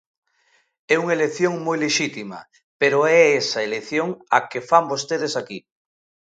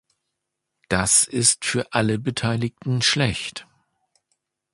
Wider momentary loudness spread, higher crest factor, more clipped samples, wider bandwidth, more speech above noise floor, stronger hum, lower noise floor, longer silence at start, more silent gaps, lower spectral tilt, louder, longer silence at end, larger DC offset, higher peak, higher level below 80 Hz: first, 14 LU vs 10 LU; about the same, 20 dB vs 22 dB; neither; second, 9.2 kHz vs 12 kHz; second, 43 dB vs 59 dB; neither; second, -64 dBFS vs -80 dBFS; about the same, 0.9 s vs 0.9 s; first, 2.63-2.79 s vs none; about the same, -3.5 dB/octave vs -3 dB/octave; about the same, -20 LUFS vs -20 LUFS; second, 0.75 s vs 1.1 s; neither; about the same, 0 dBFS vs -2 dBFS; second, -72 dBFS vs -50 dBFS